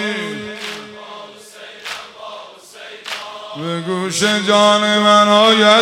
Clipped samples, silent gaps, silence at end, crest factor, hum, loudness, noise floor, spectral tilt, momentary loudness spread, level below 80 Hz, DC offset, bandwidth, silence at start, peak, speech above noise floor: under 0.1%; none; 0 s; 16 dB; none; -13 LUFS; -37 dBFS; -3 dB/octave; 24 LU; -66 dBFS; under 0.1%; 16 kHz; 0 s; 0 dBFS; 25 dB